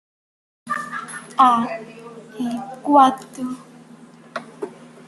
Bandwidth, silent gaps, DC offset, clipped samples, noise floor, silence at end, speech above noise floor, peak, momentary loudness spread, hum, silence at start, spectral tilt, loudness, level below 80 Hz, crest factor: 12.5 kHz; none; under 0.1%; under 0.1%; -45 dBFS; 0.35 s; 27 dB; -2 dBFS; 21 LU; none; 0.65 s; -4.5 dB/octave; -20 LUFS; -70 dBFS; 20 dB